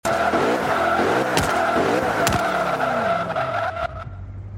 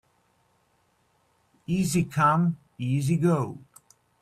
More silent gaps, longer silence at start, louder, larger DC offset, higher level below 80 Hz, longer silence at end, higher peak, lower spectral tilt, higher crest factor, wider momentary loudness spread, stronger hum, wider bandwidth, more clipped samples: neither; second, 0.05 s vs 1.7 s; first, -21 LUFS vs -25 LUFS; neither; first, -42 dBFS vs -60 dBFS; second, 0 s vs 0.65 s; first, -2 dBFS vs -8 dBFS; second, -4.5 dB/octave vs -6.5 dB/octave; about the same, 20 dB vs 20 dB; second, 9 LU vs 13 LU; neither; first, 16.5 kHz vs 14 kHz; neither